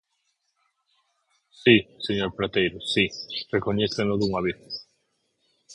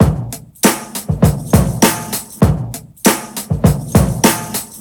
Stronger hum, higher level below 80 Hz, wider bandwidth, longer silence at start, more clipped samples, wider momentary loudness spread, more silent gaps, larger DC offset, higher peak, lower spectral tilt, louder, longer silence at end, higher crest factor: neither; second, -54 dBFS vs -26 dBFS; second, 11 kHz vs over 20 kHz; first, 1.65 s vs 0 s; neither; first, 13 LU vs 10 LU; neither; neither; about the same, -2 dBFS vs 0 dBFS; about the same, -5.5 dB/octave vs -5 dB/octave; second, -24 LUFS vs -15 LUFS; about the same, 0 s vs 0 s; first, 24 dB vs 14 dB